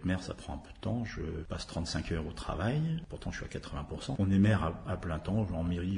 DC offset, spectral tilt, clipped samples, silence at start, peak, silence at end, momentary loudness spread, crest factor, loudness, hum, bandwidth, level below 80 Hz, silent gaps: under 0.1%; -6.5 dB/octave; under 0.1%; 0 s; -16 dBFS; 0 s; 13 LU; 18 dB; -34 LUFS; none; 10.5 kHz; -48 dBFS; none